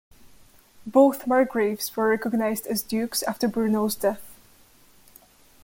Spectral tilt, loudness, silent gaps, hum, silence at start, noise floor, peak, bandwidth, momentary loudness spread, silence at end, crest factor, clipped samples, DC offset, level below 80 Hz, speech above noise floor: -4.5 dB/octave; -24 LUFS; none; none; 0.25 s; -55 dBFS; -6 dBFS; 17 kHz; 8 LU; 1.3 s; 20 dB; under 0.1%; under 0.1%; -62 dBFS; 32 dB